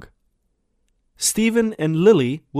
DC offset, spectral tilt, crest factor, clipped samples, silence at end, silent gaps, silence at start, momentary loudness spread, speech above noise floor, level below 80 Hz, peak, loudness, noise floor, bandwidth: under 0.1%; -4.5 dB/octave; 18 dB; under 0.1%; 0 s; none; 1.2 s; 6 LU; 51 dB; -54 dBFS; -2 dBFS; -18 LUFS; -69 dBFS; 16 kHz